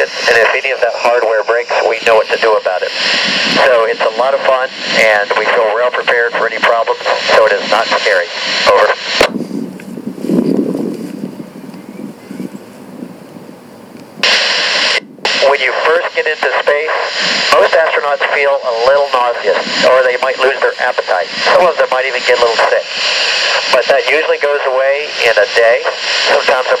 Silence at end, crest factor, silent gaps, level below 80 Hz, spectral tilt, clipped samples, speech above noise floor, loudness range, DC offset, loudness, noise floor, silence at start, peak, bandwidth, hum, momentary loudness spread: 0 s; 12 dB; none; -54 dBFS; -2.5 dB/octave; 0.1%; 22 dB; 6 LU; under 0.1%; -11 LUFS; -34 dBFS; 0 s; 0 dBFS; 15 kHz; none; 13 LU